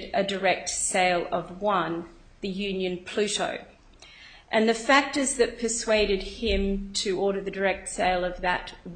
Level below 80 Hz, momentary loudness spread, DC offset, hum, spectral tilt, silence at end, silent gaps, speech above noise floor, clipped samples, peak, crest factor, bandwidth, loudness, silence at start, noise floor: -44 dBFS; 9 LU; under 0.1%; none; -3 dB/octave; 0 s; none; 24 dB; under 0.1%; -6 dBFS; 20 dB; 9.6 kHz; -26 LUFS; 0 s; -50 dBFS